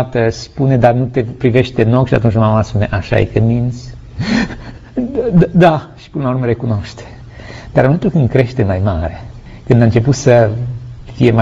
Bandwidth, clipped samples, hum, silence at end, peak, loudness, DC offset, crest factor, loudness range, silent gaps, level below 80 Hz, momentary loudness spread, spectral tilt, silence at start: 7.8 kHz; under 0.1%; none; 0 s; 0 dBFS; -14 LUFS; under 0.1%; 14 dB; 3 LU; none; -34 dBFS; 19 LU; -7.5 dB/octave; 0 s